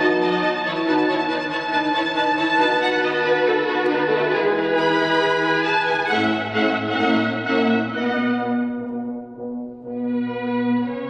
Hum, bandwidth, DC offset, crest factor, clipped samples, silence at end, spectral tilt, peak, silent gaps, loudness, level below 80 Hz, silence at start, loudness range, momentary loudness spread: none; 9.2 kHz; under 0.1%; 14 dB; under 0.1%; 0 s; -5.5 dB/octave; -6 dBFS; none; -20 LUFS; -60 dBFS; 0 s; 4 LU; 8 LU